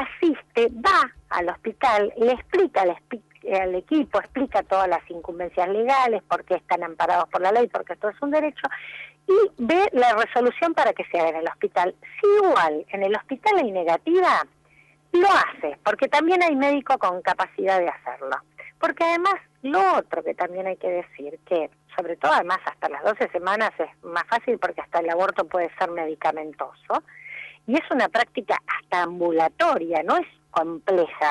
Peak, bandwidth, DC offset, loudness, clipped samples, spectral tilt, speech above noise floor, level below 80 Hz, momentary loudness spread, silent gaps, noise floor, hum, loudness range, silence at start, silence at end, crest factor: -10 dBFS; 11.5 kHz; under 0.1%; -23 LUFS; under 0.1%; -4.5 dB/octave; 35 dB; -60 dBFS; 10 LU; none; -57 dBFS; none; 4 LU; 0 s; 0 s; 12 dB